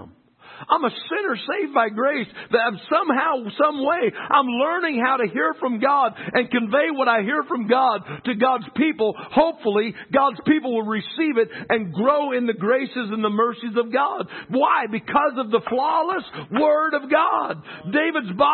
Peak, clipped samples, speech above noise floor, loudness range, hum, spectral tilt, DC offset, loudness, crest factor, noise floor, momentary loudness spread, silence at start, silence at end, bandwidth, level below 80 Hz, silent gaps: -4 dBFS; under 0.1%; 27 dB; 2 LU; none; -10 dB/octave; under 0.1%; -21 LUFS; 16 dB; -47 dBFS; 5 LU; 0 s; 0 s; 4.4 kHz; -66 dBFS; none